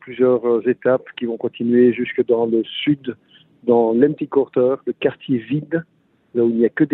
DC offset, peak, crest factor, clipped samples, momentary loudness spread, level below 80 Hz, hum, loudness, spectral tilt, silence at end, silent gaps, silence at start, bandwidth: under 0.1%; -2 dBFS; 16 dB; under 0.1%; 9 LU; -64 dBFS; none; -19 LUFS; -10 dB/octave; 0 s; none; 0.05 s; 4 kHz